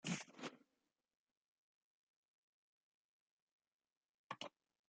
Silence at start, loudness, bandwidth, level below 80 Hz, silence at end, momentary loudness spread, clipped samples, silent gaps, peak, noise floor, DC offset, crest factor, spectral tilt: 0.05 s; -52 LUFS; 9 kHz; under -90 dBFS; 0.4 s; 8 LU; under 0.1%; 1.19-3.59 s, 3.67-3.80 s, 3.92-4.30 s; -30 dBFS; under -90 dBFS; under 0.1%; 26 dB; -3.5 dB/octave